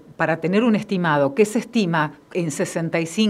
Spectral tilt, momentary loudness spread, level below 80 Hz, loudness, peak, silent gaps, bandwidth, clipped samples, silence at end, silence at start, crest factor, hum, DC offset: -5.5 dB/octave; 6 LU; -64 dBFS; -21 LUFS; -4 dBFS; none; 14 kHz; under 0.1%; 0 s; 0.1 s; 16 dB; none; under 0.1%